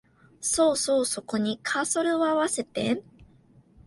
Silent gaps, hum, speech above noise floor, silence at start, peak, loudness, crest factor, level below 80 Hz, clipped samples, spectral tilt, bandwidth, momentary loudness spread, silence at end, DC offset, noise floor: none; none; 32 dB; 0.4 s; -12 dBFS; -26 LUFS; 16 dB; -62 dBFS; under 0.1%; -3 dB/octave; 12 kHz; 6 LU; 0.6 s; under 0.1%; -57 dBFS